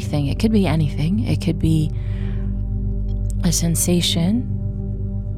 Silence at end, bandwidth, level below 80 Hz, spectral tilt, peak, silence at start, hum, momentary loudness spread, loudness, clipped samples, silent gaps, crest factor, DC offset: 0 s; 16 kHz; -26 dBFS; -5.5 dB/octave; -6 dBFS; 0 s; 50 Hz at -30 dBFS; 8 LU; -20 LUFS; under 0.1%; none; 14 dB; 0.8%